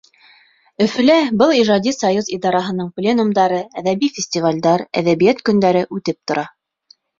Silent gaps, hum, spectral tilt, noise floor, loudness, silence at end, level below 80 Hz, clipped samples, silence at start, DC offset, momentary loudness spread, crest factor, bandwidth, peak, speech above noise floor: none; none; -5 dB/octave; -54 dBFS; -16 LUFS; 0.7 s; -58 dBFS; under 0.1%; 0.8 s; under 0.1%; 9 LU; 16 dB; 7.6 kHz; -2 dBFS; 38 dB